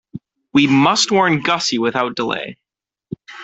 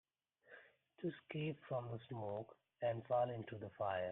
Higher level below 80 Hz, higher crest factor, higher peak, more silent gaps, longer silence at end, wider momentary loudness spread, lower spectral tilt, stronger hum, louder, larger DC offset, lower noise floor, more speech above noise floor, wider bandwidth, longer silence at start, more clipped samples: first, -58 dBFS vs -80 dBFS; about the same, 16 dB vs 18 dB; first, -2 dBFS vs -26 dBFS; neither; about the same, 0 s vs 0 s; about the same, 20 LU vs 21 LU; second, -4 dB/octave vs -9 dB/octave; neither; first, -16 LUFS vs -44 LUFS; neither; second, -37 dBFS vs -69 dBFS; second, 21 dB vs 26 dB; first, 8.4 kHz vs 4 kHz; second, 0.15 s vs 0.5 s; neither